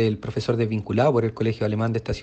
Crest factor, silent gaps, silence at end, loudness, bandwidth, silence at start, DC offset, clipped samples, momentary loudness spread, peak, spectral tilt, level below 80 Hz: 14 dB; none; 0 s; -23 LUFS; 8.4 kHz; 0 s; under 0.1%; under 0.1%; 5 LU; -8 dBFS; -8 dB/octave; -46 dBFS